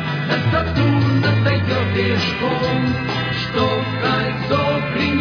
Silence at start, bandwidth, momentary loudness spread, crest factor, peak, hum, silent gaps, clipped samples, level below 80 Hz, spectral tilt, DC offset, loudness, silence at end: 0 s; 5.4 kHz; 4 LU; 14 dB; -4 dBFS; none; none; under 0.1%; -40 dBFS; -7 dB/octave; under 0.1%; -18 LUFS; 0 s